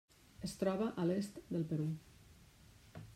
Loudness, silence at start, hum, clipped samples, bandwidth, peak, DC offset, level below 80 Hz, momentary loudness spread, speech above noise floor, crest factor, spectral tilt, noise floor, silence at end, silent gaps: -40 LUFS; 0.4 s; none; under 0.1%; 16 kHz; -24 dBFS; under 0.1%; -68 dBFS; 12 LU; 24 dB; 18 dB; -7 dB/octave; -63 dBFS; 0 s; none